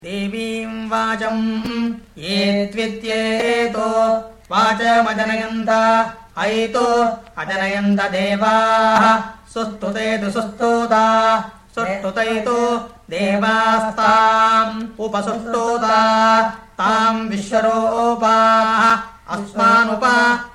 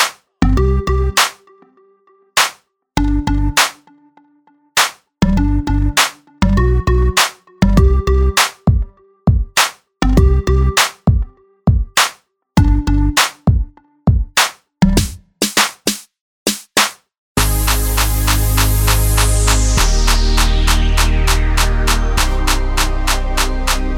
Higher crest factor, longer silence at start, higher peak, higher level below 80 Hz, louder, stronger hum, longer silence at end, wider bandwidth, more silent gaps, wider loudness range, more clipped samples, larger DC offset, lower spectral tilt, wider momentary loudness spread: about the same, 16 dB vs 14 dB; about the same, 0.05 s vs 0 s; about the same, -2 dBFS vs 0 dBFS; second, -50 dBFS vs -18 dBFS; about the same, -17 LUFS vs -15 LUFS; neither; about the same, 0.05 s vs 0 s; second, 13 kHz vs over 20 kHz; second, none vs 16.21-16.46 s, 17.18-17.35 s; about the same, 3 LU vs 3 LU; neither; neither; about the same, -4.5 dB/octave vs -4 dB/octave; first, 11 LU vs 6 LU